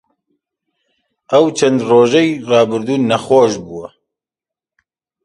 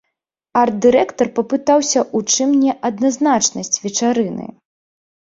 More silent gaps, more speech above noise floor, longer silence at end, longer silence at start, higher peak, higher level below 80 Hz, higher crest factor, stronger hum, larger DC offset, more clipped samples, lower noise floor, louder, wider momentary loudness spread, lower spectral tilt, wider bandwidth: neither; first, 75 dB vs 60 dB; first, 1.35 s vs 0.75 s; first, 1.3 s vs 0.55 s; about the same, 0 dBFS vs -2 dBFS; about the same, -58 dBFS vs -58 dBFS; about the same, 16 dB vs 16 dB; neither; neither; neither; first, -88 dBFS vs -76 dBFS; first, -13 LUFS vs -16 LUFS; about the same, 8 LU vs 6 LU; first, -5 dB/octave vs -3 dB/octave; first, 11.5 kHz vs 7.8 kHz